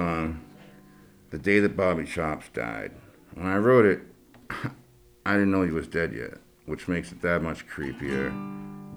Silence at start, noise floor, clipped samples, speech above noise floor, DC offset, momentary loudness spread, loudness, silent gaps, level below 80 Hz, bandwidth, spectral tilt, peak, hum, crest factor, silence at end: 0 s; -53 dBFS; under 0.1%; 27 dB; under 0.1%; 17 LU; -27 LUFS; none; -50 dBFS; over 20 kHz; -7 dB/octave; -6 dBFS; none; 20 dB; 0 s